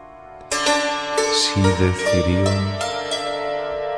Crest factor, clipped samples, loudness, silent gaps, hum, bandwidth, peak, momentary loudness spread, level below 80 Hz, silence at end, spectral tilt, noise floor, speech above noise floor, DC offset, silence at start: 16 dB; under 0.1%; -20 LUFS; none; none; 11 kHz; -4 dBFS; 7 LU; -42 dBFS; 0 s; -4 dB/octave; -40 dBFS; 22 dB; under 0.1%; 0 s